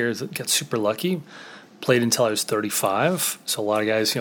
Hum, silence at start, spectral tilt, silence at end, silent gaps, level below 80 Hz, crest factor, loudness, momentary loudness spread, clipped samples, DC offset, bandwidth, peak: none; 0 s; -3 dB/octave; 0 s; none; -72 dBFS; 20 dB; -22 LUFS; 10 LU; under 0.1%; under 0.1%; over 20 kHz; -4 dBFS